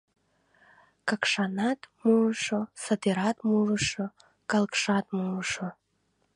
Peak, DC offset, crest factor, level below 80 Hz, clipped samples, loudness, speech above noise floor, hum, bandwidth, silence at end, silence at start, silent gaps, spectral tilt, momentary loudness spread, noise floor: -10 dBFS; under 0.1%; 20 dB; -64 dBFS; under 0.1%; -28 LUFS; 46 dB; none; 11 kHz; 0.65 s; 1.05 s; none; -4.5 dB/octave; 10 LU; -73 dBFS